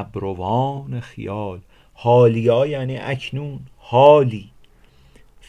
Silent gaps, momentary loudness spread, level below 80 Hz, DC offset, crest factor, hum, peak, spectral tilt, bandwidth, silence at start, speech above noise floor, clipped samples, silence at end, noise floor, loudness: none; 19 LU; -48 dBFS; under 0.1%; 20 dB; none; 0 dBFS; -8 dB/octave; 9.6 kHz; 0 s; 33 dB; under 0.1%; 1.05 s; -51 dBFS; -18 LUFS